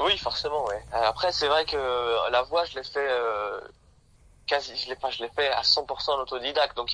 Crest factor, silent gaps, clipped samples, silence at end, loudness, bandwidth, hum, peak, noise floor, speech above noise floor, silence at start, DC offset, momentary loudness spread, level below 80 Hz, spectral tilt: 18 dB; none; under 0.1%; 0 s; -26 LUFS; 10.5 kHz; none; -10 dBFS; -58 dBFS; 31 dB; 0 s; under 0.1%; 8 LU; -54 dBFS; -2.5 dB/octave